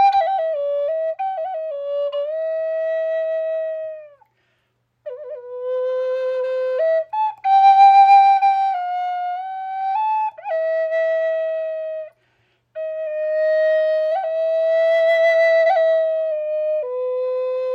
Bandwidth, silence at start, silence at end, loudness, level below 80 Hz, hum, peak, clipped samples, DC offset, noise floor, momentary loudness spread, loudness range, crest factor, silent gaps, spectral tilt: 7 kHz; 0 s; 0 s; -19 LUFS; -76 dBFS; none; -4 dBFS; under 0.1%; under 0.1%; -68 dBFS; 13 LU; 11 LU; 16 dB; none; -1 dB/octave